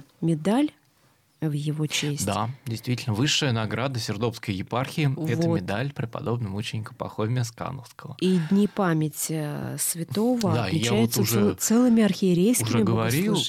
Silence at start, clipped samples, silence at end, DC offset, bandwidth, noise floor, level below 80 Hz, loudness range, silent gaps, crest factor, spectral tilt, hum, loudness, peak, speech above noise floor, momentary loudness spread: 0.2 s; under 0.1%; 0 s; under 0.1%; 16.5 kHz; -63 dBFS; -60 dBFS; 6 LU; none; 14 dB; -5 dB/octave; none; -25 LUFS; -10 dBFS; 38 dB; 10 LU